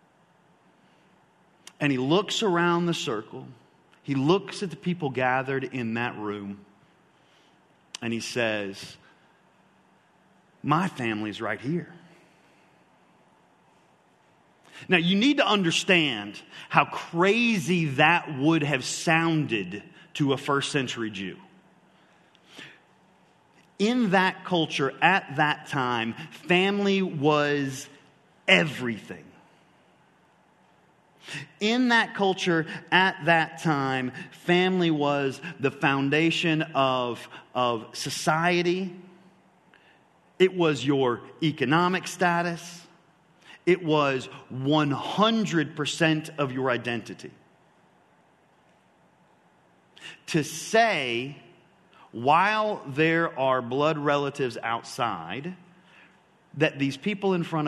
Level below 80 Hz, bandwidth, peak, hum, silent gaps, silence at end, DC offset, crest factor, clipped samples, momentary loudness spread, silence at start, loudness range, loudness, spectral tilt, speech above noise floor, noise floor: -70 dBFS; 12.5 kHz; -2 dBFS; none; none; 0 s; under 0.1%; 24 dB; under 0.1%; 16 LU; 1.8 s; 9 LU; -25 LUFS; -5 dB/octave; 36 dB; -62 dBFS